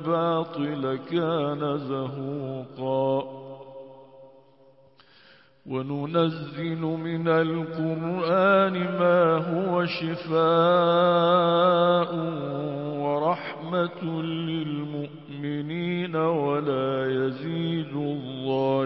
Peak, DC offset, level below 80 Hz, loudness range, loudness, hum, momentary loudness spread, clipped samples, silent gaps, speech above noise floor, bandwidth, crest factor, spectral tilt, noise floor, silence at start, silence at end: -8 dBFS; under 0.1%; -70 dBFS; 11 LU; -25 LUFS; none; 12 LU; under 0.1%; none; 32 dB; 5.8 kHz; 18 dB; -11 dB/octave; -57 dBFS; 0 s; 0 s